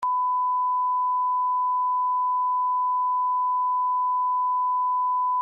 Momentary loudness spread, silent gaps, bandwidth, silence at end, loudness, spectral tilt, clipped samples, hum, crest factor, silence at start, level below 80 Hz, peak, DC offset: 0 LU; none; 1.8 kHz; 0 s; -23 LUFS; 6.5 dB/octave; under 0.1%; 50 Hz at -115 dBFS; 4 dB; 0 s; under -90 dBFS; -20 dBFS; under 0.1%